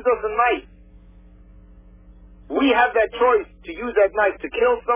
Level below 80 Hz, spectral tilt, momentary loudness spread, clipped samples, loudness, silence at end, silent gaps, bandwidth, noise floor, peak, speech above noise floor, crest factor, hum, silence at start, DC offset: -46 dBFS; -8 dB/octave; 10 LU; under 0.1%; -20 LUFS; 0 s; none; 3.7 kHz; -47 dBFS; -6 dBFS; 27 dB; 16 dB; none; 0 s; under 0.1%